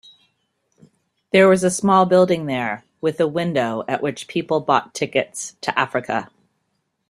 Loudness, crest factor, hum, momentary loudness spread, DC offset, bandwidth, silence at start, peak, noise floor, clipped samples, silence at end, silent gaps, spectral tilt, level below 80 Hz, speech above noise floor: -19 LUFS; 20 dB; none; 12 LU; under 0.1%; 13 kHz; 1.35 s; -2 dBFS; -72 dBFS; under 0.1%; 0.85 s; none; -5 dB/octave; -62 dBFS; 53 dB